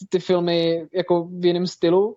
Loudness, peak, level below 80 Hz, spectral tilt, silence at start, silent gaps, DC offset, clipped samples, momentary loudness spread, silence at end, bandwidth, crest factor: -21 LUFS; -8 dBFS; -66 dBFS; -6.5 dB/octave; 0 s; none; under 0.1%; under 0.1%; 3 LU; 0 s; 7.6 kHz; 12 dB